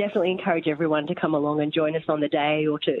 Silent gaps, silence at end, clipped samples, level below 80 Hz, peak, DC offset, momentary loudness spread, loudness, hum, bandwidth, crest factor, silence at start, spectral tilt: none; 0 s; under 0.1%; -70 dBFS; -10 dBFS; under 0.1%; 2 LU; -24 LUFS; none; 4.2 kHz; 14 dB; 0 s; -8.5 dB/octave